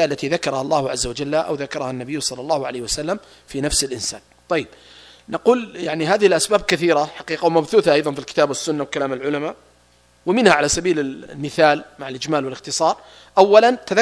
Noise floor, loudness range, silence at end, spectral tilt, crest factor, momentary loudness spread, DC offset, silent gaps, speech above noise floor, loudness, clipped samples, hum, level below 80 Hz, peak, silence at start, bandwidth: -55 dBFS; 5 LU; 0 s; -3.5 dB/octave; 20 dB; 12 LU; under 0.1%; none; 36 dB; -19 LUFS; under 0.1%; none; -46 dBFS; 0 dBFS; 0 s; 11 kHz